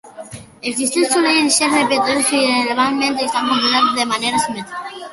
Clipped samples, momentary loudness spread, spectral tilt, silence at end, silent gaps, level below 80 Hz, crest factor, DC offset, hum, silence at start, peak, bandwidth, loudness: under 0.1%; 14 LU; -1.5 dB/octave; 0 s; none; -58 dBFS; 16 dB; under 0.1%; none; 0.05 s; -2 dBFS; 12 kHz; -15 LUFS